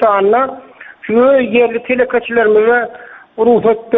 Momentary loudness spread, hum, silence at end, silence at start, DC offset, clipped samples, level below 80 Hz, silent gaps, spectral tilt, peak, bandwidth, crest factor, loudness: 13 LU; none; 0 s; 0 s; under 0.1%; under 0.1%; -52 dBFS; none; -3.5 dB/octave; 0 dBFS; 3.9 kHz; 12 dB; -12 LUFS